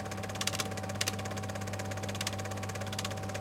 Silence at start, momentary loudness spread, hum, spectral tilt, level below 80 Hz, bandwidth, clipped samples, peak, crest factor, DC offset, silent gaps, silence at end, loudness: 0 s; 5 LU; none; -3.5 dB/octave; -60 dBFS; 17 kHz; under 0.1%; -12 dBFS; 26 dB; under 0.1%; none; 0 s; -36 LUFS